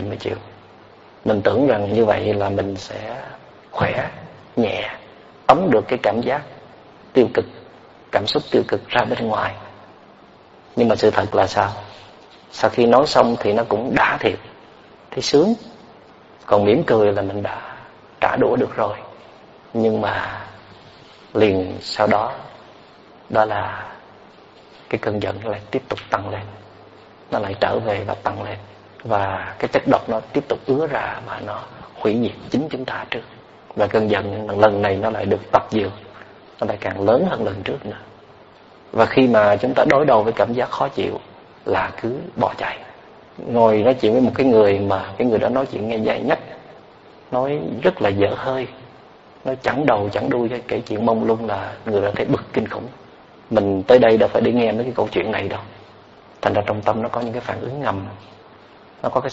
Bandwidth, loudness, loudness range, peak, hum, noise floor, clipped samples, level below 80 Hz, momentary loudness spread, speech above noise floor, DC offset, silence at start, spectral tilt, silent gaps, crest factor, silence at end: 8 kHz; -20 LUFS; 7 LU; 0 dBFS; none; -47 dBFS; under 0.1%; -52 dBFS; 16 LU; 28 dB; under 0.1%; 0 s; -4.5 dB/octave; none; 20 dB; 0 s